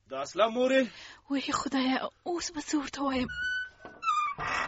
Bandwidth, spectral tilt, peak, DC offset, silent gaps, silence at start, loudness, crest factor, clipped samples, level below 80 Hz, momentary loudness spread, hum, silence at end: 8 kHz; -1.5 dB/octave; -12 dBFS; under 0.1%; none; 0.1 s; -30 LUFS; 18 dB; under 0.1%; -58 dBFS; 9 LU; none; 0 s